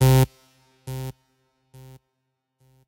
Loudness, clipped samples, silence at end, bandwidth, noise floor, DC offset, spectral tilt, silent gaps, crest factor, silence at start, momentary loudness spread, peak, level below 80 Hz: -24 LUFS; under 0.1%; 1.75 s; 17 kHz; -77 dBFS; under 0.1%; -6.5 dB/octave; none; 20 dB; 0 s; 29 LU; -4 dBFS; -42 dBFS